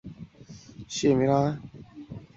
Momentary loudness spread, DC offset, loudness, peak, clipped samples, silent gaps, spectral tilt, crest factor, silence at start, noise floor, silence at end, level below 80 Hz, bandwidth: 24 LU; under 0.1%; -25 LUFS; -10 dBFS; under 0.1%; none; -6 dB/octave; 20 dB; 0.05 s; -48 dBFS; 0.1 s; -56 dBFS; 8 kHz